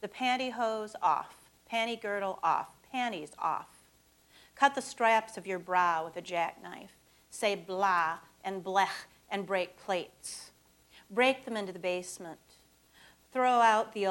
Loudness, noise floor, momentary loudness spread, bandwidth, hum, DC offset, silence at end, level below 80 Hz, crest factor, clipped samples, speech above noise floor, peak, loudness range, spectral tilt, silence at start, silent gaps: -31 LUFS; -65 dBFS; 15 LU; 17 kHz; none; under 0.1%; 0 s; -74 dBFS; 22 dB; under 0.1%; 33 dB; -10 dBFS; 4 LU; -3 dB/octave; 0 s; none